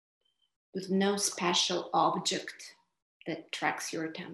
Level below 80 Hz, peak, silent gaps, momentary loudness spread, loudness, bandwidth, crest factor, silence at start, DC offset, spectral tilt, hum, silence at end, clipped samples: -82 dBFS; -14 dBFS; 3.02-3.20 s; 16 LU; -31 LUFS; 13.5 kHz; 20 dB; 0.75 s; under 0.1%; -3 dB/octave; none; 0 s; under 0.1%